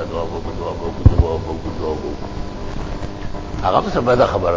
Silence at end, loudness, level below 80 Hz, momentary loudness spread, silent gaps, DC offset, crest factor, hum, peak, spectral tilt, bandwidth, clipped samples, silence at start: 0 s; -21 LUFS; -26 dBFS; 14 LU; none; under 0.1%; 18 dB; none; 0 dBFS; -7.5 dB/octave; 7.6 kHz; under 0.1%; 0 s